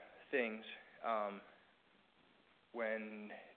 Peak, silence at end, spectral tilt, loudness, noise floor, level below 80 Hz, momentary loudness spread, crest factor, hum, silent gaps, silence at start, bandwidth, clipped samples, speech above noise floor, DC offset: -24 dBFS; 0.05 s; -2 dB/octave; -43 LUFS; -72 dBFS; -90 dBFS; 13 LU; 22 dB; none; none; 0 s; 4.5 kHz; under 0.1%; 29 dB; under 0.1%